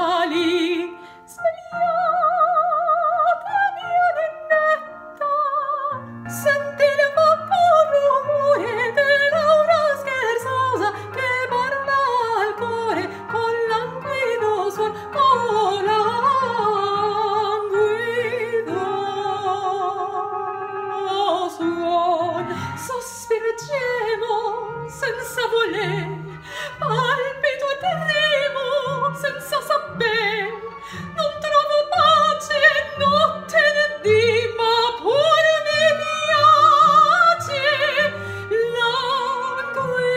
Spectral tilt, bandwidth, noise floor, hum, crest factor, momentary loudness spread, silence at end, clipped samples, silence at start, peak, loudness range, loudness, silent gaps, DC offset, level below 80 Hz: -4 dB/octave; 16 kHz; -40 dBFS; none; 18 dB; 10 LU; 0 s; under 0.1%; 0 s; -2 dBFS; 7 LU; -19 LUFS; none; under 0.1%; -60 dBFS